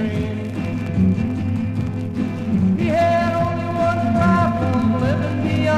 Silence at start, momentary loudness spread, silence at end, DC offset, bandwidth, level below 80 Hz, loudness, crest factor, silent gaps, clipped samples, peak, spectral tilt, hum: 0 s; 7 LU; 0 s; 0.2%; 10 kHz; -40 dBFS; -20 LUFS; 16 dB; none; under 0.1%; -4 dBFS; -8 dB/octave; none